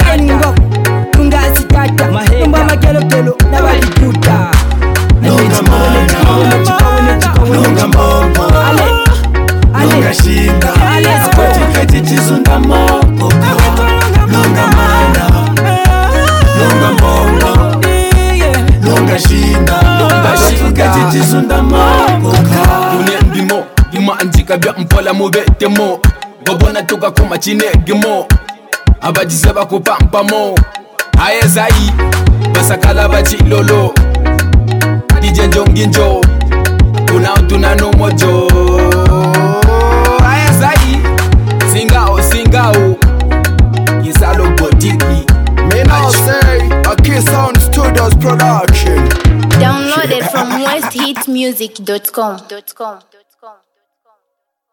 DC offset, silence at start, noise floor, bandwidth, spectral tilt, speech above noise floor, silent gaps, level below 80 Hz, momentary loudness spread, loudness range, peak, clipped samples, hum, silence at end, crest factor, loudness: under 0.1%; 0 s; -71 dBFS; 17.5 kHz; -5.5 dB/octave; 62 dB; none; -12 dBFS; 4 LU; 3 LU; 0 dBFS; under 0.1%; none; 1.2 s; 8 dB; -9 LUFS